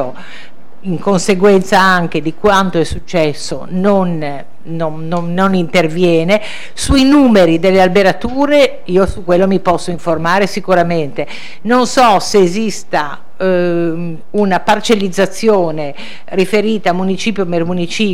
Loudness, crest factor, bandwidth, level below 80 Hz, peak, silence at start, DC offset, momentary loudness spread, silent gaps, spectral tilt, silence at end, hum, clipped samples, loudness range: -13 LUFS; 12 dB; 17.5 kHz; -34 dBFS; -2 dBFS; 0 s; 9%; 12 LU; none; -5.5 dB/octave; 0 s; none; under 0.1%; 4 LU